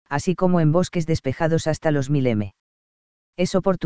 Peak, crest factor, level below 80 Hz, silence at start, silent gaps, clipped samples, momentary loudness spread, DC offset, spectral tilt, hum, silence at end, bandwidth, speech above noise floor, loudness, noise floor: -4 dBFS; 16 dB; -46 dBFS; 0.05 s; 2.60-3.33 s; under 0.1%; 8 LU; 2%; -7 dB/octave; none; 0 s; 8 kHz; over 69 dB; -22 LUFS; under -90 dBFS